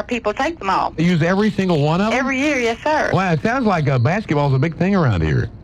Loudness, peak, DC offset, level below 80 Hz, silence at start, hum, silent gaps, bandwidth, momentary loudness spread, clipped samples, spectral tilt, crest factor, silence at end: -18 LUFS; -4 dBFS; under 0.1%; -38 dBFS; 0 s; none; none; 11 kHz; 3 LU; under 0.1%; -7 dB/octave; 14 dB; 0 s